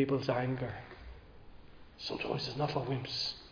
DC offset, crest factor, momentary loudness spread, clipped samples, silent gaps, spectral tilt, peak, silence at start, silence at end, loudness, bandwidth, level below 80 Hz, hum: under 0.1%; 20 dB; 18 LU; under 0.1%; none; -4.5 dB/octave; -18 dBFS; 0 s; 0 s; -36 LUFS; 5.4 kHz; -58 dBFS; none